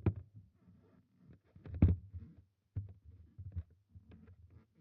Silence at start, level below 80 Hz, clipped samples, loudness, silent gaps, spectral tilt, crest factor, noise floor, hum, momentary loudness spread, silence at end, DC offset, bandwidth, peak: 0.05 s; -50 dBFS; under 0.1%; -39 LUFS; none; -11.5 dB/octave; 26 dB; -67 dBFS; none; 28 LU; 0.5 s; under 0.1%; 3.7 kHz; -14 dBFS